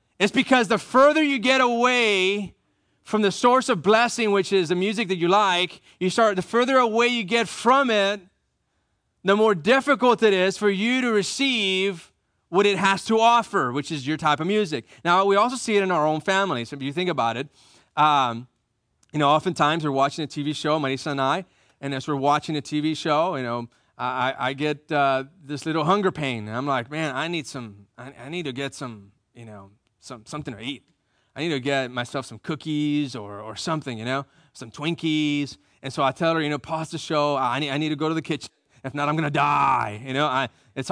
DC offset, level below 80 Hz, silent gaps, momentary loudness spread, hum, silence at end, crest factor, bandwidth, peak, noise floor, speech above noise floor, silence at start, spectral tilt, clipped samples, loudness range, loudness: under 0.1%; -66 dBFS; none; 14 LU; none; 0 s; 18 dB; 10.5 kHz; -6 dBFS; -72 dBFS; 50 dB; 0.2 s; -4.5 dB/octave; under 0.1%; 8 LU; -22 LUFS